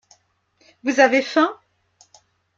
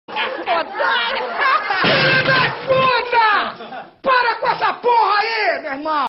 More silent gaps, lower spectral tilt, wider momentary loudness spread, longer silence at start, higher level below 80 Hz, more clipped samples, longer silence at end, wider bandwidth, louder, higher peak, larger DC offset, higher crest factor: neither; second, -2.5 dB/octave vs -6.5 dB/octave; about the same, 8 LU vs 9 LU; first, 0.85 s vs 0.1 s; second, -72 dBFS vs -56 dBFS; neither; first, 1.05 s vs 0 s; first, 7.6 kHz vs 6 kHz; about the same, -18 LUFS vs -16 LUFS; about the same, -2 dBFS vs -4 dBFS; neither; first, 20 dB vs 14 dB